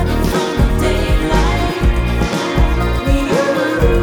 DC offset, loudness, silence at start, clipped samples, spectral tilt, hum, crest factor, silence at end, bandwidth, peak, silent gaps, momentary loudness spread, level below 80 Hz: under 0.1%; -16 LUFS; 0 s; under 0.1%; -6 dB/octave; none; 14 dB; 0 s; 18.5 kHz; 0 dBFS; none; 2 LU; -18 dBFS